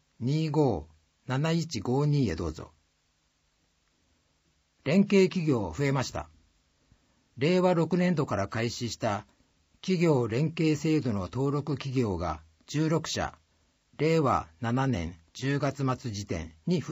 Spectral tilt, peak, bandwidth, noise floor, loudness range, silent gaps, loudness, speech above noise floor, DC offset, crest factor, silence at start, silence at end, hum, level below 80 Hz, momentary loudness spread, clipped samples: -6.5 dB/octave; -12 dBFS; 15.5 kHz; -72 dBFS; 4 LU; none; -29 LUFS; 45 dB; under 0.1%; 18 dB; 0.2 s; 0 s; none; -54 dBFS; 11 LU; under 0.1%